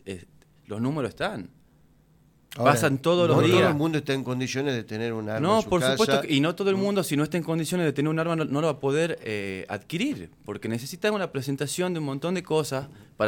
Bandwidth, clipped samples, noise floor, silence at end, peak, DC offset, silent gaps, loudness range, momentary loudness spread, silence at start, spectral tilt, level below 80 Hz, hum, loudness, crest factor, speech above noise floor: 17.5 kHz; under 0.1%; -60 dBFS; 0 s; -6 dBFS; under 0.1%; none; 5 LU; 12 LU; 0.05 s; -5.5 dB/octave; -60 dBFS; none; -25 LUFS; 20 dB; 34 dB